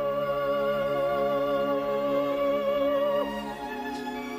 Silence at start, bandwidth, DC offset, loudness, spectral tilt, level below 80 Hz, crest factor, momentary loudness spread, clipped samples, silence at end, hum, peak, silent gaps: 0 s; 15.5 kHz; under 0.1%; -27 LUFS; -6 dB/octave; -56 dBFS; 12 dB; 8 LU; under 0.1%; 0 s; none; -16 dBFS; none